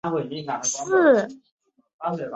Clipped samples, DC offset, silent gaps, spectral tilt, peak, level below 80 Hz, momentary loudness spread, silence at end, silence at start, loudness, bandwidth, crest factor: under 0.1%; under 0.1%; 1.52-1.58 s, 1.93-1.99 s; -4 dB/octave; -6 dBFS; -68 dBFS; 14 LU; 0 s; 0.05 s; -22 LUFS; 8.2 kHz; 16 dB